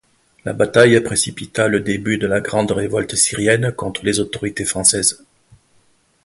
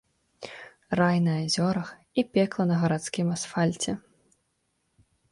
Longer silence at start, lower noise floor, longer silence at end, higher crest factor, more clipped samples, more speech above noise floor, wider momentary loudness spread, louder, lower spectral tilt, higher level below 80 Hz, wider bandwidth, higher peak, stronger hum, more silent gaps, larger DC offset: about the same, 0.45 s vs 0.4 s; second, -57 dBFS vs -75 dBFS; second, 1.1 s vs 1.35 s; about the same, 18 dB vs 18 dB; neither; second, 40 dB vs 49 dB; second, 9 LU vs 18 LU; first, -17 LUFS vs -27 LUFS; second, -3.5 dB/octave vs -5.5 dB/octave; first, -46 dBFS vs -62 dBFS; about the same, 12 kHz vs 11.5 kHz; first, 0 dBFS vs -10 dBFS; neither; neither; neither